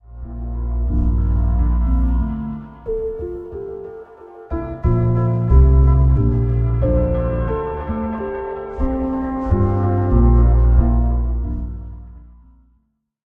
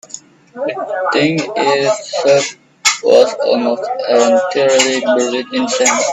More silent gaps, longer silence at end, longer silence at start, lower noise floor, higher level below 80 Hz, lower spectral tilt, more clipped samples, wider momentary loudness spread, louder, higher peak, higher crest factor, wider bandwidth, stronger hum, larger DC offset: neither; first, 1.05 s vs 0 s; about the same, 0.1 s vs 0.15 s; first, -64 dBFS vs -36 dBFS; first, -20 dBFS vs -60 dBFS; first, -12 dB/octave vs -2.5 dB/octave; neither; first, 16 LU vs 10 LU; second, -19 LUFS vs -14 LUFS; about the same, -2 dBFS vs 0 dBFS; about the same, 16 dB vs 14 dB; second, 2.9 kHz vs 13 kHz; neither; neither